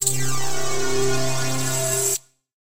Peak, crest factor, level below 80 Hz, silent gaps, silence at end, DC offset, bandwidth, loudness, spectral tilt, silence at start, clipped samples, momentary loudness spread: -6 dBFS; 16 dB; -46 dBFS; none; 0.1 s; under 0.1%; 16 kHz; -23 LUFS; -3 dB/octave; 0 s; under 0.1%; 5 LU